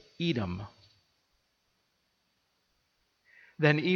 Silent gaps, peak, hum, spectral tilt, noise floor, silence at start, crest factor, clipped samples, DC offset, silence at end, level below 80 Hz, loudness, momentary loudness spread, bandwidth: none; -10 dBFS; none; -7.5 dB/octave; -76 dBFS; 0.2 s; 24 dB; under 0.1%; under 0.1%; 0 s; -66 dBFS; -30 LUFS; 16 LU; 6.8 kHz